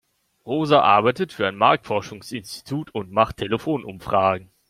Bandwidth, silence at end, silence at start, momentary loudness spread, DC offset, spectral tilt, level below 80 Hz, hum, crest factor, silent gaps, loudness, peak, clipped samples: 15.5 kHz; 0.25 s; 0.45 s; 13 LU; under 0.1%; -5.5 dB/octave; -54 dBFS; none; 20 dB; none; -21 LUFS; -2 dBFS; under 0.1%